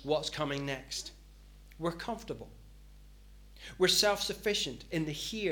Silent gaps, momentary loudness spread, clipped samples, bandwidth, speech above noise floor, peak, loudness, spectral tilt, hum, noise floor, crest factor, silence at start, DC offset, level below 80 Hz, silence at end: none; 19 LU; under 0.1%; 19 kHz; 21 dB; -12 dBFS; -32 LUFS; -3 dB/octave; 50 Hz at -55 dBFS; -54 dBFS; 22 dB; 0 s; under 0.1%; -54 dBFS; 0 s